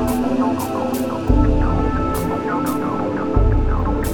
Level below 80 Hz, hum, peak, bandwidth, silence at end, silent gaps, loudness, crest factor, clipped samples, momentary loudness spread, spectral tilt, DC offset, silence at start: -22 dBFS; none; -2 dBFS; 18.5 kHz; 0 s; none; -20 LUFS; 14 dB; under 0.1%; 4 LU; -7.5 dB/octave; under 0.1%; 0 s